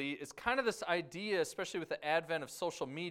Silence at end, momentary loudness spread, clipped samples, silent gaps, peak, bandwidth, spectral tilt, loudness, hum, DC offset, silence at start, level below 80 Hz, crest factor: 0 s; 6 LU; under 0.1%; none; -16 dBFS; 16 kHz; -3.5 dB/octave; -37 LUFS; none; under 0.1%; 0 s; -70 dBFS; 20 dB